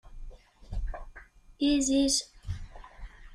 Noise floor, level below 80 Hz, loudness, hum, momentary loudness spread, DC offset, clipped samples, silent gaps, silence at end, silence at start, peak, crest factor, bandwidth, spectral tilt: -52 dBFS; -42 dBFS; -28 LUFS; none; 25 LU; under 0.1%; under 0.1%; none; 0 s; 0.05 s; -16 dBFS; 16 dB; 15 kHz; -3.5 dB/octave